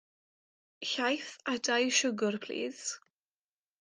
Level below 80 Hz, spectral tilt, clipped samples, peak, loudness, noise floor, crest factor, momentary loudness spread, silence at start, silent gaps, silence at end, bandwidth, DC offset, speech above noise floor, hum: -84 dBFS; -2 dB/octave; under 0.1%; -14 dBFS; -32 LUFS; under -90 dBFS; 20 dB; 12 LU; 0.8 s; none; 0.85 s; 10.5 kHz; under 0.1%; over 58 dB; none